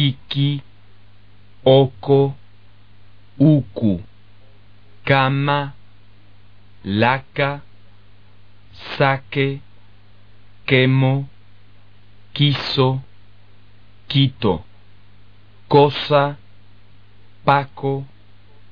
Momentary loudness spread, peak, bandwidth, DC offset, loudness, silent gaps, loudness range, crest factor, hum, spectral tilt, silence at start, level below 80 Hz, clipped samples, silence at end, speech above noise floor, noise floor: 17 LU; 0 dBFS; 5.2 kHz; 0.9%; -18 LUFS; none; 4 LU; 20 dB; 50 Hz at -50 dBFS; -5 dB/octave; 0 s; -52 dBFS; under 0.1%; 0.65 s; 34 dB; -50 dBFS